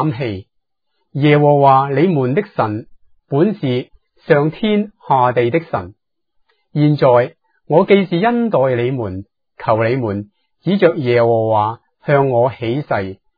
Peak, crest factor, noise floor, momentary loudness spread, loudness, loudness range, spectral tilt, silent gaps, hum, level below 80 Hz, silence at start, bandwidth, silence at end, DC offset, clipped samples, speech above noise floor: 0 dBFS; 16 dB; -72 dBFS; 14 LU; -15 LUFS; 2 LU; -10.5 dB/octave; none; none; -56 dBFS; 0 s; 5 kHz; 0.25 s; under 0.1%; under 0.1%; 58 dB